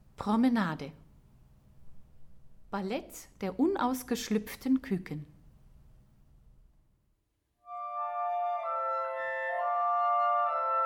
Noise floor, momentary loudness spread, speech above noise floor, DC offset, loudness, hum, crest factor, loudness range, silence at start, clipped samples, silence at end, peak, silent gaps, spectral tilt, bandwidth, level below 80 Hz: -77 dBFS; 14 LU; 46 dB; under 0.1%; -31 LUFS; none; 16 dB; 8 LU; 0.2 s; under 0.1%; 0 s; -16 dBFS; none; -5.5 dB/octave; 19 kHz; -62 dBFS